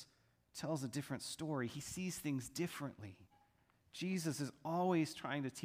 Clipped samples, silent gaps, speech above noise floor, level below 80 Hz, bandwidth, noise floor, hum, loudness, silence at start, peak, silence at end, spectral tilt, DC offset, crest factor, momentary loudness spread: under 0.1%; none; 33 dB; -74 dBFS; 15.5 kHz; -75 dBFS; none; -42 LUFS; 0 s; -24 dBFS; 0 s; -5 dB/octave; under 0.1%; 18 dB; 14 LU